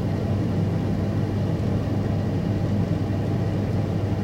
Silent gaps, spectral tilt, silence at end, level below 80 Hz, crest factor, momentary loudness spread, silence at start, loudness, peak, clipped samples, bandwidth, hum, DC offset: none; -8.5 dB/octave; 0 s; -40 dBFS; 12 dB; 1 LU; 0 s; -25 LUFS; -12 dBFS; under 0.1%; 8.8 kHz; none; under 0.1%